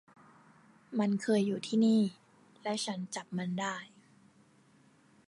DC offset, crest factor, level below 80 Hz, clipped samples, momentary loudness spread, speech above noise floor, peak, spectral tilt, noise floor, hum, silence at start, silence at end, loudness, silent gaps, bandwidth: under 0.1%; 16 dB; -82 dBFS; under 0.1%; 12 LU; 33 dB; -18 dBFS; -5.5 dB/octave; -64 dBFS; none; 0.9 s; 1.4 s; -33 LUFS; none; 11.5 kHz